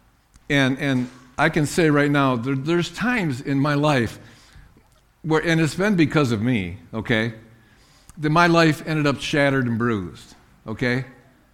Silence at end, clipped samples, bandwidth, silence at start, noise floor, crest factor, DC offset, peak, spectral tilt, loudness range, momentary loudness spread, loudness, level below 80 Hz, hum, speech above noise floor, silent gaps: 0.4 s; under 0.1%; 15.5 kHz; 0.5 s; -56 dBFS; 18 dB; under 0.1%; -4 dBFS; -6 dB/octave; 2 LU; 11 LU; -21 LUFS; -48 dBFS; none; 36 dB; none